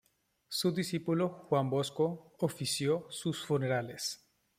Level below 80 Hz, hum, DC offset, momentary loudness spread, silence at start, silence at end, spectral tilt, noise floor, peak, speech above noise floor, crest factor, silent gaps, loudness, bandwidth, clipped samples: -74 dBFS; none; under 0.1%; 6 LU; 0.5 s; 0.4 s; -5 dB/octave; -65 dBFS; -16 dBFS; 31 dB; 18 dB; none; -34 LUFS; 16 kHz; under 0.1%